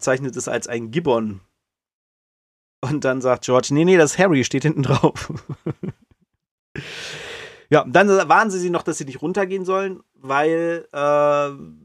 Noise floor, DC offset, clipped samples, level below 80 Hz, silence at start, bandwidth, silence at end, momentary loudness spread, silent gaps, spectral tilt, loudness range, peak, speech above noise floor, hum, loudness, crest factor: -61 dBFS; under 0.1%; under 0.1%; -56 dBFS; 0 s; 13 kHz; 0.1 s; 17 LU; 1.93-2.82 s, 6.51-6.75 s; -5.5 dB/octave; 6 LU; -2 dBFS; 42 dB; none; -19 LUFS; 18 dB